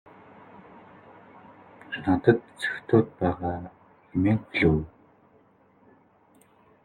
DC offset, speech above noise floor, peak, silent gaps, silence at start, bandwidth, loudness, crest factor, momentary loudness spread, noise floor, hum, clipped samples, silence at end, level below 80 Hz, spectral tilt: under 0.1%; 36 dB; -4 dBFS; none; 1.9 s; 11.5 kHz; -26 LUFS; 24 dB; 15 LU; -60 dBFS; none; under 0.1%; 2 s; -52 dBFS; -8 dB/octave